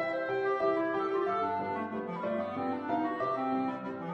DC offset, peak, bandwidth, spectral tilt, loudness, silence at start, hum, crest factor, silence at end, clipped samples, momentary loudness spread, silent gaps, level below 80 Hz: under 0.1%; -18 dBFS; 6.6 kHz; -7.5 dB/octave; -32 LUFS; 0 s; none; 16 dB; 0 s; under 0.1%; 6 LU; none; -74 dBFS